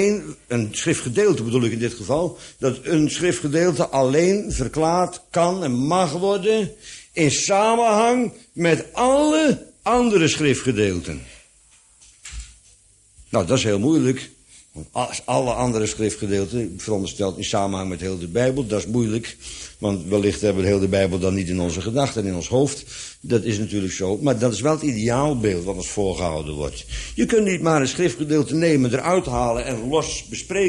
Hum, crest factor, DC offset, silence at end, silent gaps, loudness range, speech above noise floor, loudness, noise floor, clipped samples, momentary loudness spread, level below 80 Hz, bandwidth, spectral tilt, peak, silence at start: none; 18 dB; under 0.1%; 0 s; none; 5 LU; 34 dB; -21 LUFS; -54 dBFS; under 0.1%; 10 LU; -42 dBFS; 11.5 kHz; -5 dB/octave; -2 dBFS; 0 s